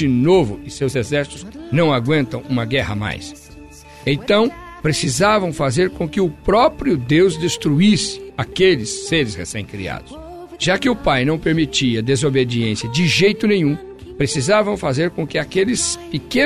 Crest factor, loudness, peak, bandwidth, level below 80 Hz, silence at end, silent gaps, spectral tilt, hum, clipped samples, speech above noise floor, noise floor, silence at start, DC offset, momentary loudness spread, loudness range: 14 dB; -18 LUFS; -4 dBFS; 13.5 kHz; -40 dBFS; 0 s; none; -5 dB/octave; none; under 0.1%; 22 dB; -39 dBFS; 0 s; 0.2%; 12 LU; 4 LU